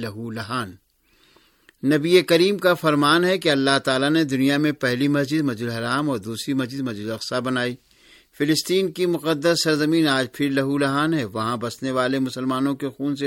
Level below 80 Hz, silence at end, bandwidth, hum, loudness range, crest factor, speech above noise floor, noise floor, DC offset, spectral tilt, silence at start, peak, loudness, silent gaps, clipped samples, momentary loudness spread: -62 dBFS; 0 s; 17 kHz; none; 6 LU; 20 dB; 38 dB; -60 dBFS; under 0.1%; -5 dB/octave; 0 s; -2 dBFS; -21 LUFS; none; under 0.1%; 10 LU